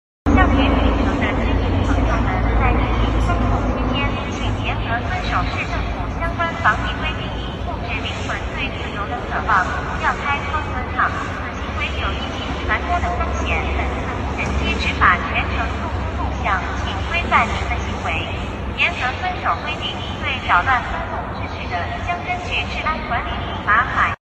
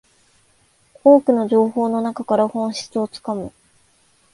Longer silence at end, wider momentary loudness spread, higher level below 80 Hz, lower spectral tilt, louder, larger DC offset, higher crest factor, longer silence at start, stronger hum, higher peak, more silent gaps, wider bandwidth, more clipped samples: second, 0.2 s vs 0.85 s; second, 8 LU vs 14 LU; first, -26 dBFS vs -62 dBFS; about the same, -6 dB/octave vs -6 dB/octave; about the same, -20 LUFS vs -18 LUFS; neither; about the same, 18 dB vs 18 dB; second, 0.25 s vs 1.05 s; neither; about the same, 0 dBFS vs -2 dBFS; neither; second, 8.4 kHz vs 11.5 kHz; neither